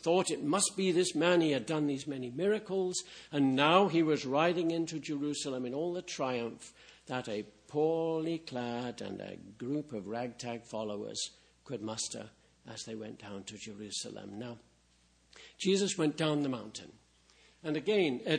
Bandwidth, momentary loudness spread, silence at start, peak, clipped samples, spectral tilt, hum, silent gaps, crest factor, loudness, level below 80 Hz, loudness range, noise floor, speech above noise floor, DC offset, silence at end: 10.5 kHz; 16 LU; 0 s; -12 dBFS; under 0.1%; -4.5 dB/octave; none; none; 22 dB; -33 LUFS; -74 dBFS; 11 LU; -68 dBFS; 35 dB; under 0.1%; 0 s